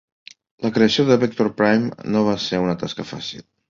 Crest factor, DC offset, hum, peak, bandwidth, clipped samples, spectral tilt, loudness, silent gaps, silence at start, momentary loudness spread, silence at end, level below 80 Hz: 18 dB; under 0.1%; none; -2 dBFS; 7.4 kHz; under 0.1%; -6 dB/octave; -20 LUFS; none; 0.6 s; 12 LU; 0.3 s; -56 dBFS